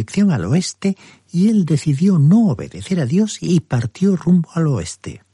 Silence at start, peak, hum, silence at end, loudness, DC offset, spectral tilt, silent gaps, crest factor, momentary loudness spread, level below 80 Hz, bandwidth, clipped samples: 0 s; -4 dBFS; none; 0.15 s; -17 LUFS; under 0.1%; -7 dB/octave; none; 12 dB; 10 LU; -50 dBFS; 11.5 kHz; under 0.1%